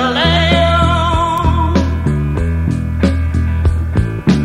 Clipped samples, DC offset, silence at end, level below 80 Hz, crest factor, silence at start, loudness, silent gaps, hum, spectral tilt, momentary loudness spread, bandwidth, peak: under 0.1%; 0.3%; 0 s; -20 dBFS; 12 dB; 0 s; -14 LUFS; none; none; -6.5 dB/octave; 6 LU; 10.5 kHz; 0 dBFS